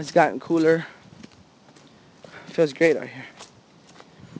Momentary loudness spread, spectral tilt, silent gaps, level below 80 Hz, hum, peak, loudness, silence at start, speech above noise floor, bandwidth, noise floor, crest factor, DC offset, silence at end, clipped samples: 23 LU; -6 dB/octave; none; -68 dBFS; none; -4 dBFS; -22 LUFS; 0 s; 31 dB; 8 kHz; -52 dBFS; 22 dB; under 0.1%; 0.15 s; under 0.1%